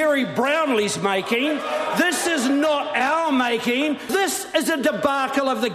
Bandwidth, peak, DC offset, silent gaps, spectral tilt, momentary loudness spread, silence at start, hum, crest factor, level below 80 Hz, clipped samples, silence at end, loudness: 14 kHz; -6 dBFS; under 0.1%; none; -3 dB/octave; 3 LU; 0 s; none; 14 dB; -64 dBFS; under 0.1%; 0 s; -21 LUFS